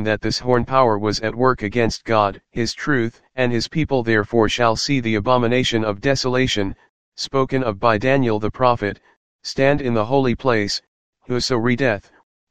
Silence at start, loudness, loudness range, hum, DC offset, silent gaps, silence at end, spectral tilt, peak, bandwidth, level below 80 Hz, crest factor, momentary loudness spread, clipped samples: 0 s; -19 LUFS; 2 LU; none; 2%; 6.89-7.12 s, 9.16-9.39 s, 10.88-11.13 s, 12.23-12.47 s; 0 s; -5.5 dB/octave; 0 dBFS; 9.8 kHz; -42 dBFS; 18 dB; 7 LU; under 0.1%